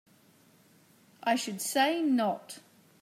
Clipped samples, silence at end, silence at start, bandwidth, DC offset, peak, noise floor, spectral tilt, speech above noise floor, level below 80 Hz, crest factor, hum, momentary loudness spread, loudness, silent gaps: under 0.1%; 0.4 s; 1.25 s; 16 kHz; under 0.1%; -14 dBFS; -62 dBFS; -3 dB/octave; 33 dB; -88 dBFS; 18 dB; none; 16 LU; -29 LUFS; none